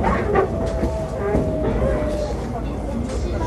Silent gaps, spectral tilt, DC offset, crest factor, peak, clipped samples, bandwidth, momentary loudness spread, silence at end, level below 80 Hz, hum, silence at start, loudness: none; -7.5 dB/octave; under 0.1%; 16 dB; -4 dBFS; under 0.1%; 12.5 kHz; 7 LU; 0 s; -28 dBFS; none; 0 s; -23 LUFS